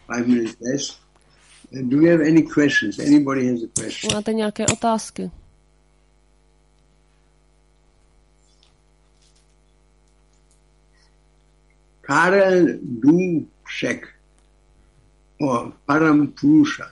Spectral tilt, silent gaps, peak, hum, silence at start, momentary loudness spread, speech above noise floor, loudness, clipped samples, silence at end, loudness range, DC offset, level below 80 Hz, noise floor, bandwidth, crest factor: -5 dB/octave; none; -4 dBFS; none; 0.1 s; 13 LU; 39 dB; -19 LUFS; under 0.1%; 0.05 s; 8 LU; under 0.1%; -56 dBFS; -58 dBFS; 11.5 kHz; 18 dB